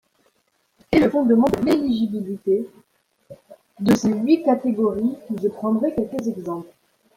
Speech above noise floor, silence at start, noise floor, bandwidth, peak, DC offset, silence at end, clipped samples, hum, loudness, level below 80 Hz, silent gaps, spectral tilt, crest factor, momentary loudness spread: 47 dB; 0.9 s; -67 dBFS; 16 kHz; -4 dBFS; under 0.1%; 0.5 s; under 0.1%; none; -21 LUFS; -52 dBFS; none; -7 dB/octave; 18 dB; 10 LU